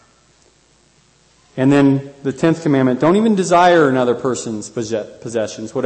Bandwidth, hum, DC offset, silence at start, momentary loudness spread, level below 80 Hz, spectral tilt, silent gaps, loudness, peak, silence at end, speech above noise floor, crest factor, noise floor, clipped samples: 8.8 kHz; none; under 0.1%; 1.55 s; 13 LU; -56 dBFS; -6 dB/octave; none; -16 LUFS; -2 dBFS; 0 s; 39 dB; 14 dB; -54 dBFS; under 0.1%